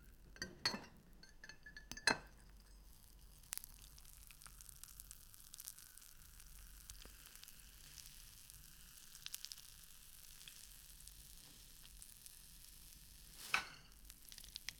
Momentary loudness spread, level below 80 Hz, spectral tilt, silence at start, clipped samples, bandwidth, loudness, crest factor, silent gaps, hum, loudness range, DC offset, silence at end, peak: 19 LU; -64 dBFS; -1 dB/octave; 0 s; under 0.1%; 19 kHz; -49 LUFS; 36 dB; none; none; 12 LU; under 0.1%; 0 s; -16 dBFS